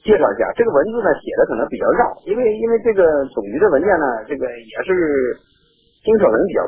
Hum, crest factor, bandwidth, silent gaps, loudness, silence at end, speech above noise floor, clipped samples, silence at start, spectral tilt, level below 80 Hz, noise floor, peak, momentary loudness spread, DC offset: none; 16 dB; 3.7 kHz; none; -17 LUFS; 0 s; 42 dB; under 0.1%; 0.05 s; -10 dB/octave; -46 dBFS; -58 dBFS; -2 dBFS; 10 LU; under 0.1%